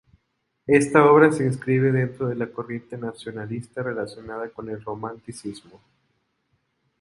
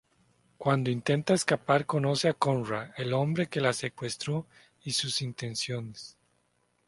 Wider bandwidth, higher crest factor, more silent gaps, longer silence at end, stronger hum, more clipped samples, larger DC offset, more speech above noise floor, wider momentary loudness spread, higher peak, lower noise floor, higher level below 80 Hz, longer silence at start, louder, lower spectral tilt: about the same, 11.5 kHz vs 11.5 kHz; about the same, 22 dB vs 24 dB; neither; first, 1.4 s vs 0.75 s; neither; neither; neither; first, 52 dB vs 43 dB; first, 20 LU vs 9 LU; first, 0 dBFS vs -6 dBFS; about the same, -74 dBFS vs -72 dBFS; first, -60 dBFS vs -66 dBFS; about the same, 0.7 s vs 0.6 s; first, -22 LUFS vs -29 LUFS; first, -7 dB/octave vs -5 dB/octave